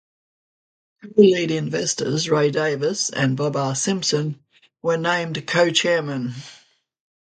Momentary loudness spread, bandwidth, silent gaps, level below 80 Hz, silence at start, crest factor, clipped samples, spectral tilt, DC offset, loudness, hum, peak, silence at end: 12 LU; 9.4 kHz; none; -64 dBFS; 1.05 s; 20 dB; under 0.1%; -4 dB/octave; under 0.1%; -21 LUFS; none; -2 dBFS; 0.75 s